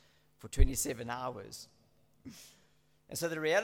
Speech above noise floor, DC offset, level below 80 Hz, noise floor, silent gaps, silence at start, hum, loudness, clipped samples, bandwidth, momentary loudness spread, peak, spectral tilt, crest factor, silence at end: 38 dB; under 0.1%; -38 dBFS; -71 dBFS; none; 0.45 s; none; -36 LUFS; under 0.1%; 17 kHz; 23 LU; -10 dBFS; -4 dB/octave; 24 dB; 0 s